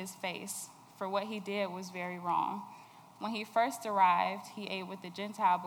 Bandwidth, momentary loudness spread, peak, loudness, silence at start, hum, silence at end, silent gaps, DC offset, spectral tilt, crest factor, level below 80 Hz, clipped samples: over 20 kHz; 14 LU; -16 dBFS; -35 LUFS; 0 s; none; 0 s; none; under 0.1%; -4 dB/octave; 20 dB; -88 dBFS; under 0.1%